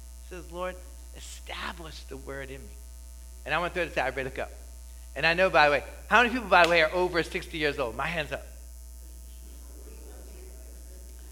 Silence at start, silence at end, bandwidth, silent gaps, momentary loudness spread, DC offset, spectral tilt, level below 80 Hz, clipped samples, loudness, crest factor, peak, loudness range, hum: 0 s; 0 s; 17.5 kHz; none; 25 LU; under 0.1%; -4 dB/octave; -44 dBFS; under 0.1%; -26 LUFS; 26 dB; -4 dBFS; 15 LU; none